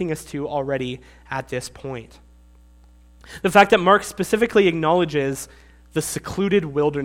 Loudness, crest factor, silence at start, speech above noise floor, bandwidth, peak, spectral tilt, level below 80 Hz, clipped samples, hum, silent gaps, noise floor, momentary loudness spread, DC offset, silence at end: -20 LUFS; 22 dB; 0 s; 29 dB; 16.5 kHz; 0 dBFS; -5 dB/octave; -48 dBFS; under 0.1%; 60 Hz at -45 dBFS; none; -50 dBFS; 17 LU; under 0.1%; 0 s